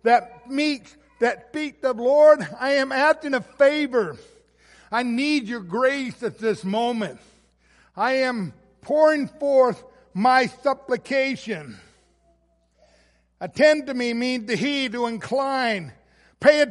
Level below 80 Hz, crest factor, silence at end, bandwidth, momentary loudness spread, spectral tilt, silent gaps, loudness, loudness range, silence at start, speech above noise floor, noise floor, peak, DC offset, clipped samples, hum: -64 dBFS; 20 dB; 0 s; 11.5 kHz; 13 LU; -4.5 dB/octave; none; -22 LUFS; 5 LU; 0.05 s; 43 dB; -64 dBFS; -2 dBFS; under 0.1%; under 0.1%; none